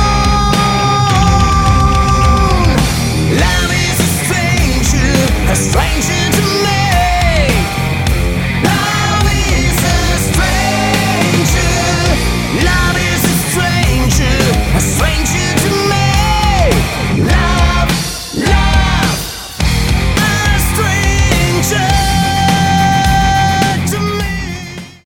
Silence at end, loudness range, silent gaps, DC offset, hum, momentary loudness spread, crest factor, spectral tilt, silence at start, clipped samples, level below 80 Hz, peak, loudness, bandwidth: 0.15 s; 2 LU; none; under 0.1%; none; 4 LU; 12 dB; -4.5 dB/octave; 0 s; under 0.1%; -18 dBFS; 0 dBFS; -12 LUFS; 17.5 kHz